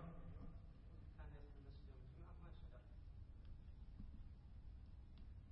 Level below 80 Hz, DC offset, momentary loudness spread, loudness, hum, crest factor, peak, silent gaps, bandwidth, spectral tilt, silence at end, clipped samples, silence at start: -58 dBFS; under 0.1%; 3 LU; -61 LUFS; none; 14 dB; -42 dBFS; none; 5.6 kHz; -8 dB/octave; 0 s; under 0.1%; 0 s